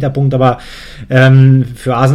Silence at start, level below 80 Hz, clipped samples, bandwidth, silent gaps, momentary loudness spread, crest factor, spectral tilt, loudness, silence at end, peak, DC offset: 0 s; -36 dBFS; under 0.1%; 11 kHz; none; 19 LU; 10 dB; -8 dB/octave; -10 LUFS; 0 s; 0 dBFS; under 0.1%